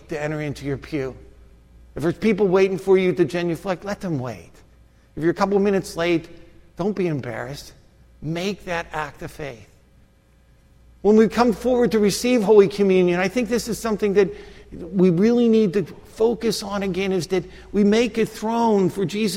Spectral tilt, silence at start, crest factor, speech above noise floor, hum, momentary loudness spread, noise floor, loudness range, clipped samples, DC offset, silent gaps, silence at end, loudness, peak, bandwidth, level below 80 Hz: -6 dB/octave; 0.1 s; 20 dB; 35 dB; none; 15 LU; -55 dBFS; 10 LU; under 0.1%; under 0.1%; none; 0 s; -21 LUFS; -2 dBFS; 16 kHz; -48 dBFS